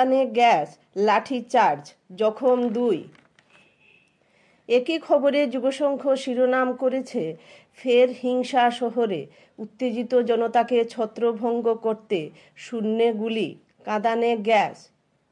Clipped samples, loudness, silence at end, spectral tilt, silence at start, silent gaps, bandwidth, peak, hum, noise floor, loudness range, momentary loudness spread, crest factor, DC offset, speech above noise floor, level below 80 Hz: under 0.1%; -23 LUFS; 0.6 s; -5 dB/octave; 0 s; none; 10.5 kHz; -6 dBFS; none; -62 dBFS; 3 LU; 12 LU; 16 dB; under 0.1%; 39 dB; -80 dBFS